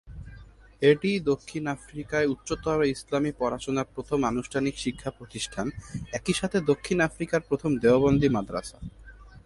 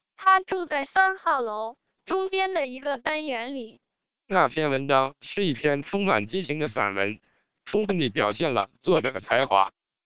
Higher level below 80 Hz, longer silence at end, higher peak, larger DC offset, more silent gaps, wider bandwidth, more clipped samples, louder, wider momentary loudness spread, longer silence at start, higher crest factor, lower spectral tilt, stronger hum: first, -48 dBFS vs -64 dBFS; second, 0.05 s vs 0.4 s; about the same, -8 dBFS vs -6 dBFS; second, under 0.1% vs 0.2%; neither; first, 11.5 kHz vs 4 kHz; neither; about the same, -27 LUFS vs -25 LUFS; first, 14 LU vs 9 LU; second, 0.05 s vs 0.2 s; about the same, 20 dB vs 20 dB; second, -5.5 dB/octave vs -9 dB/octave; neither